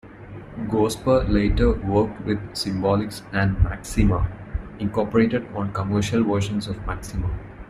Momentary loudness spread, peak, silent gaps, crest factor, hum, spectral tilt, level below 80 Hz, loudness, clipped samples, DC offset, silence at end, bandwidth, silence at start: 10 LU; -4 dBFS; none; 18 dB; none; -6.5 dB/octave; -30 dBFS; -23 LUFS; under 0.1%; under 0.1%; 0 s; 15 kHz; 0.05 s